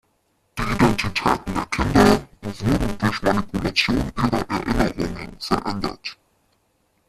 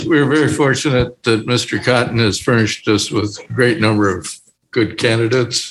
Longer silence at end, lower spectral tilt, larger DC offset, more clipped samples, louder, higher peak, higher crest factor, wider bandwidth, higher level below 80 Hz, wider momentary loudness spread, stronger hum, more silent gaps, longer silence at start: first, 0.95 s vs 0 s; about the same, -5.5 dB/octave vs -5 dB/octave; neither; neither; second, -21 LUFS vs -16 LUFS; about the same, -2 dBFS vs 0 dBFS; first, 20 dB vs 14 dB; first, 14.5 kHz vs 12.5 kHz; first, -36 dBFS vs -44 dBFS; first, 12 LU vs 7 LU; neither; neither; first, 0.55 s vs 0 s